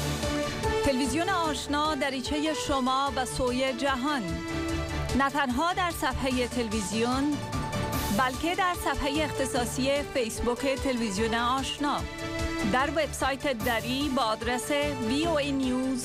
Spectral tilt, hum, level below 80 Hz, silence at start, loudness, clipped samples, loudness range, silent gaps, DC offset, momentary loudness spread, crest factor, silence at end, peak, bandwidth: -4 dB/octave; none; -42 dBFS; 0 s; -28 LUFS; under 0.1%; 1 LU; none; under 0.1%; 4 LU; 12 dB; 0 s; -16 dBFS; 16 kHz